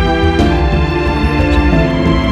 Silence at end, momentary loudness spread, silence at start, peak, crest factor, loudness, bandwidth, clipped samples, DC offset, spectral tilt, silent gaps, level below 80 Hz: 0 s; 2 LU; 0 s; 0 dBFS; 12 dB; -13 LUFS; 9.2 kHz; under 0.1%; under 0.1%; -7.5 dB/octave; none; -16 dBFS